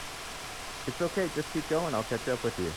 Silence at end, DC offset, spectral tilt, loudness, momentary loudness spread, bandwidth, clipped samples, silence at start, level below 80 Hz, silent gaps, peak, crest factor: 0 s; under 0.1%; -4.5 dB/octave; -32 LUFS; 9 LU; 20 kHz; under 0.1%; 0 s; -52 dBFS; none; -16 dBFS; 16 dB